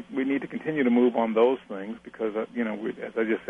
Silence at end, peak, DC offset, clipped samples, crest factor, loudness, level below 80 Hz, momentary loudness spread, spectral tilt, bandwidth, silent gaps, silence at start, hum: 0 s; -10 dBFS; under 0.1%; under 0.1%; 16 dB; -26 LUFS; -70 dBFS; 11 LU; -8 dB/octave; 3.8 kHz; none; 0 s; none